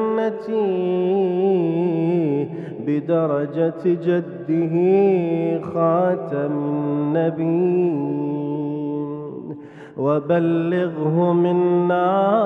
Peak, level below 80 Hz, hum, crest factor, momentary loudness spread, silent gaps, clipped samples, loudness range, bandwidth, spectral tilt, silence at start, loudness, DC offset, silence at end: -6 dBFS; -68 dBFS; none; 14 dB; 7 LU; none; under 0.1%; 3 LU; 4.7 kHz; -10.5 dB/octave; 0 s; -20 LUFS; under 0.1%; 0 s